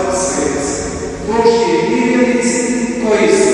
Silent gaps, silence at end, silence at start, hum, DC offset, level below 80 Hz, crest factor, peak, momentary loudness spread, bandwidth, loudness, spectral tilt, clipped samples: none; 0 s; 0 s; none; under 0.1%; -36 dBFS; 14 dB; 0 dBFS; 7 LU; 11.5 kHz; -14 LUFS; -4 dB/octave; under 0.1%